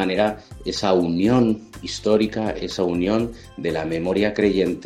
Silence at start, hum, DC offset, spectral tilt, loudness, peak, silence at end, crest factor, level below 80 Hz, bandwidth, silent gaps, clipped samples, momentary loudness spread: 0 s; none; under 0.1%; -6 dB/octave; -22 LUFS; -4 dBFS; 0 s; 16 dB; -46 dBFS; 13.5 kHz; none; under 0.1%; 10 LU